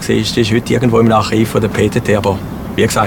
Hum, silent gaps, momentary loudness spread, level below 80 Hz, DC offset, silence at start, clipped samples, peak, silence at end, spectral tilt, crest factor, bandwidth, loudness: none; none; 6 LU; -34 dBFS; under 0.1%; 0 s; under 0.1%; 0 dBFS; 0 s; -5.5 dB/octave; 12 dB; 18 kHz; -13 LUFS